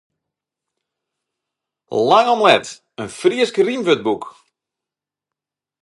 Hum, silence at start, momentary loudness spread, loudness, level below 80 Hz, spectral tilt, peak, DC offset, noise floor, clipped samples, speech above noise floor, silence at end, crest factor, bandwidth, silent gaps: none; 1.9 s; 18 LU; -16 LUFS; -66 dBFS; -4 dB/octave; 0 dBFS; under 0.1%; -87 dBFS; under 0.1%; 71 dB; 1.55 s; 20 dB; 11.5 kHz; none